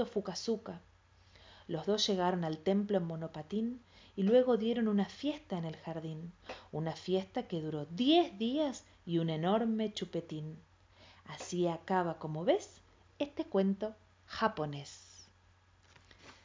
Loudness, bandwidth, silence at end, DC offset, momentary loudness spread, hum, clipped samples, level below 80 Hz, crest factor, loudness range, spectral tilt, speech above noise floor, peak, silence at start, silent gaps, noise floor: -35 LUFS; 7.6 kHz; 0.1 s; under 0.1%; 18 LU; none; under 0.1%; -68 dBFS; 20 dB; 4 LU; -6 dB/octave; 32 dB; -16 dBFS; 0 s; none; -66 dBFS